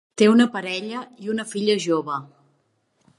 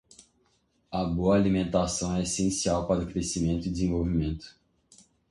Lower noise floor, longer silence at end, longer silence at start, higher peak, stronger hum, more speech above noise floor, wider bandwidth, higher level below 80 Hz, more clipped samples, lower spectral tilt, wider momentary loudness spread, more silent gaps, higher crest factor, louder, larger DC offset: about the same, -68 dBFS vs -70 dBFS; about the same, 0.9 s vs 0.8 s; second, 0.15 s vs 0.9 s; first, -4 dBFS vs -12 dBFS; neither; first, 47 dB vs 43 dB; about the same, 11.5 kHz vs 11.5 kHz; second, -72 dBFS vs -42 dBFS; neither; about the same, -5 dB/octave vs -5.5 dB/octave; first, 15 LU vs 7 LU; neither; about the same, 18 dB vs 16 dB; first, -22 LUFS vs -28 LUFS; neither